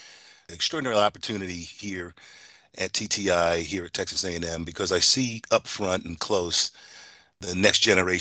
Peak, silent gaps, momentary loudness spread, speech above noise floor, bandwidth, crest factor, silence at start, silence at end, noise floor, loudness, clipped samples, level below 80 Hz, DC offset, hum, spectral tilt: -4 dBFS; none; 15 LU; 24 dB; 9.4 kHz; 22 dB; 0 s; 0 s; -50 dBFS; -25 LUFS; under 0.1%; -58 dBFS; under 0.1%; none; -2.5 dB/octave